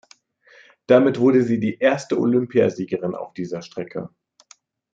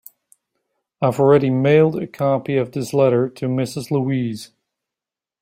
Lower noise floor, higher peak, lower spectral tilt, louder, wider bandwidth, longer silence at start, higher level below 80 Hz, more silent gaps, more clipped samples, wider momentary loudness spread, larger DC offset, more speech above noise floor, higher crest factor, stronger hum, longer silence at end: second, -55 dBFS vs -88 dBFS; about the same, -2 dBFS vs -2 dBFS; about the same, -7 dB/octave vs -7.5 dB/octave; about the same, -20 LUFS vs -18 LUFS; second, 7.8 kHz vs 16 kHz; about the same, 0.9 s vs 1 s; second, -68 dBFS vs -60 dBFS; neither; neither; first, 15 LU vs 8 LU; neither; second, 35 dB vs 71 dB; about the same, 18 dB vs 18 dB; neither; about the same, 0.85 s vs 0.95 s